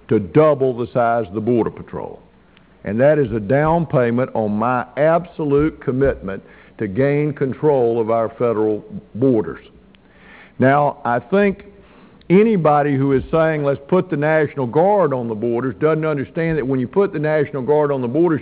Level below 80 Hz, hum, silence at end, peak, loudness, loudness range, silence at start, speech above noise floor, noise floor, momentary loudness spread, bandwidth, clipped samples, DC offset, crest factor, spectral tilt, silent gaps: -44 dBFS; none; 0 s; -2 dBFS; -18 LUFS; 3 LU; 0.1 s; 33 dB; -50 dBFS; 8 LU; 4 kHz; under 0.1%; under 0.1%; 16 dB; -12 dB/octave; none